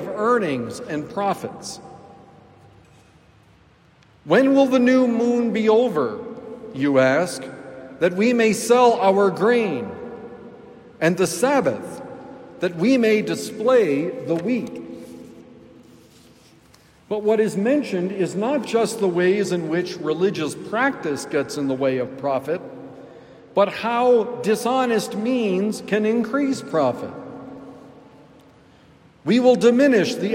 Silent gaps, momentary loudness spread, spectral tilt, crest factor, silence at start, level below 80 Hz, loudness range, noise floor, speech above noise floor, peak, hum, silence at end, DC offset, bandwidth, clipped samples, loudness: none; 20 LU; -5.5 dB/octave; 18 dB; 0 s; -64 dBFS; 7 LU; -54 dBFS; 34 dB; -4 dBFS; none; 0 s; under 0.1%; 16 kHz; under 0.1%; -20 LUFS